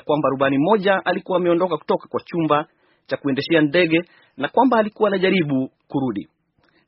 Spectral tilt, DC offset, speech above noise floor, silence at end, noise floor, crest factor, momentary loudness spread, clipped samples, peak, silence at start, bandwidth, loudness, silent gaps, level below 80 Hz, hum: -4.5 dB/octave; under 0.1%; 43 dB; 0.65 s; -62 dBFS; 18 dB; 10 LU; under 0.1%; -2 dBFS; 0.05 s; 5.8 kHz; -20 LUFS; none; -62 dBFS; none